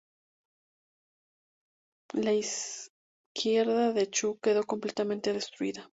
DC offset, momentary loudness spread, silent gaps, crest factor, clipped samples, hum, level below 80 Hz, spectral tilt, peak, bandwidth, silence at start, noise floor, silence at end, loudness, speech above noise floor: under 0.1%; 11 LU; 2.89-3.35 s; 16 dB; under 0.1%; none; -76 dBFS; -3 dB/octave; -16 dBFS; 8 kHz; 2.15 s; under -90 dBFS; 0.05 s; -30 LUFS; over 61 dB